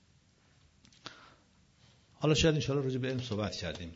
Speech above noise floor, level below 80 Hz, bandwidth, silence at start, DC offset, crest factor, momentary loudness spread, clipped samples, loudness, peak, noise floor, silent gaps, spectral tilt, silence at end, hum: 35 dB; -54 dBFS; 8 kHz; 1.05 s; under 0.1%; 20 dB; 23 LU; under 0.1%; -32 LUFS; -14 dBFS; -66 dBFS; none; -5 dB/octave; 0 s; none